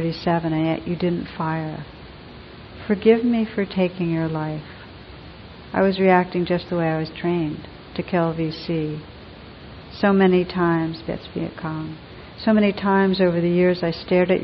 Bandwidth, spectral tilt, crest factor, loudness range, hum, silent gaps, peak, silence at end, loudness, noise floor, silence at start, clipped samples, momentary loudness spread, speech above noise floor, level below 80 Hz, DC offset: 5.8 kHz; -10 dB/octave; 18 dB; 3 LU; none; none; -4 dBFS; 0 s; -21 LUFS; -40 dBFS; 0 s; under 0.1%; 23 LU; 20 dB; -48 dBFS; under 0.1%